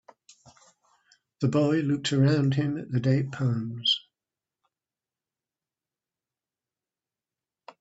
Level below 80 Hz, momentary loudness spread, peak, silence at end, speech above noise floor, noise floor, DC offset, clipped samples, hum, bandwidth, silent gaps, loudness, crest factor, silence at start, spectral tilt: -66 dBFS; 6 LU; -12 dBFS; 3.8 s; over 65 dB; under -90 dBFS; under 0.1%; under 0.1%; none; 8 kHz; none; -26 LUFS; 18 dB; 1.4 s; -6.5 dB/octave